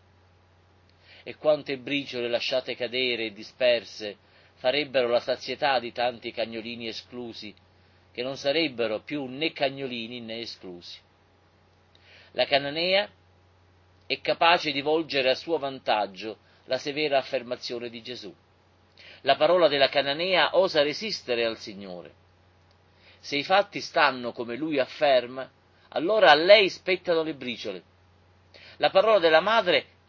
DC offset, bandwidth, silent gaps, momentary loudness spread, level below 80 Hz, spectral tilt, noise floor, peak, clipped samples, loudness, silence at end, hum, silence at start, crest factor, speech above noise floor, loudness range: under 0.1%; 7.2 kHz; none; 18 LU; -68 dBFS; -4 dB/octave; -61 dBFS; -2 dBFS; under 0.1%; -25 LUFS; 0.25 s; none; 1.25 s; 24 dB; 36 dB; 8 LU